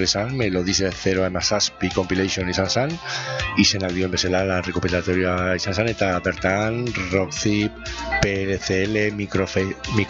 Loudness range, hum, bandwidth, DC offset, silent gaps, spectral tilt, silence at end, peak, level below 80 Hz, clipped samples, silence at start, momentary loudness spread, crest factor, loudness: 1 LU; none; 8 kHz; under 0.1%; none; -4 dB/octave; 0 s; 0 dBFS; -42 dBFS; under 0.1%; 0 s; 4 LU; 22 dB; -22 LUFS